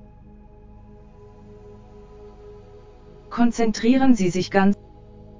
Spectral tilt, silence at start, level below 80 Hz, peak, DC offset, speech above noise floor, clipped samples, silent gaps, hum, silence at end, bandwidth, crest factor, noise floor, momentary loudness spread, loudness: -6 dB/octave; 0 s; -48 dBFS; -2 dBFS; under 0.1%; 28 dB; under 0.1%; none; none; 0 s; 7.6 kHz; 20 dB; -46 dBFS; 26 LU; -20 LUFS